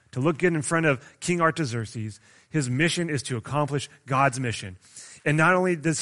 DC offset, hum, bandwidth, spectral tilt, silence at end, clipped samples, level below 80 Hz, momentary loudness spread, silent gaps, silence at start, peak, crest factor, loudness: under 0.1%; none; 11.5 kHz; -5 dB/octave; 0 s; under 0.1%; -60 dBFS; 13 LU; none; 0.15 s; -6 dBFS; 20 dB; -25 LUFS